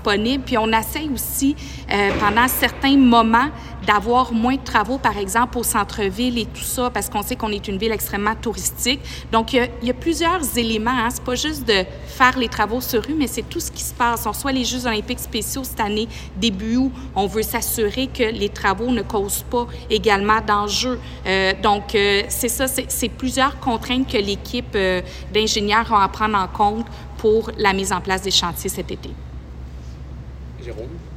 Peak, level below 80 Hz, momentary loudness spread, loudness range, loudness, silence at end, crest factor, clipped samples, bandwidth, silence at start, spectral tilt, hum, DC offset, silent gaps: 0 dBFS; -36 dBFS; 9 LU; 5 LU; -20 LUFS; 0 s; 20 dB; under 0.1%; 16.5 kHz; 0 s; -3.5 dB/octave; none; under 0.1%; none